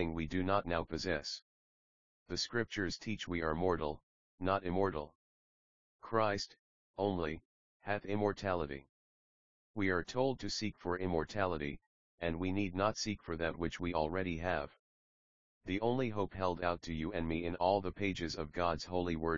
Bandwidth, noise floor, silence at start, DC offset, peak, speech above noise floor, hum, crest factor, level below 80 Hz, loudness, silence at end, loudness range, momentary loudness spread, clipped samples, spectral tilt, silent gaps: 7.4 kHz; under -90 dBFS; 0 s; 0.2%; -16 dBFS; over 54 dB; none; 22 dB; -56 dBFS; -37 LUFS; 0 s; 3 LU; 9 LU; under 0.1%; -4.5 dB/octave; 1.42-2.26 s, 4.03-4.38 s, 5.15-5.99 s, 6.59-6.94 s, 7.45-7.80 s, 8.89-9.74 s, 11.86-12.18 s, 14.79-15.61 s